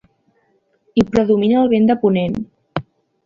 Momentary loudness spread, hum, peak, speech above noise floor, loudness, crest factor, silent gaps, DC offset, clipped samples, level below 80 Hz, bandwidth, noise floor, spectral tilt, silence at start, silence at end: 14 LU; none; -2 dBFS; 47 dB; -16 LUFS; 16 dB; none; under 0.1%; under 0.1%; -48 dBFS; 7.2 kHz; -62 dBFS; -8 dB/octave; 0.95 s; 0.45 s